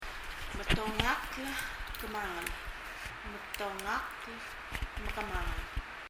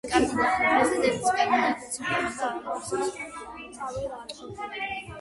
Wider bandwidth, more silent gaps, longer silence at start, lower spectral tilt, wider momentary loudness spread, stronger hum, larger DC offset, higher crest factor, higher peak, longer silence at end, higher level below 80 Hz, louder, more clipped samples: first, 16 kHz vs 11.5 kHz; neither; about the same, 0 s vs 0.05 s; about the same, -3.5 dB/octave vs -3.5 dB/octave; second, 10 LU vs 16 LU; neither; neither; first, 26 dB vs 18 dB; about the same, -12 dBFS vs -10 dBFS; about the same, 0 s vs 0 s; first, -44 dBFS vs -54 dBFS; second, -37 LUFS vs -26 LUFS; neither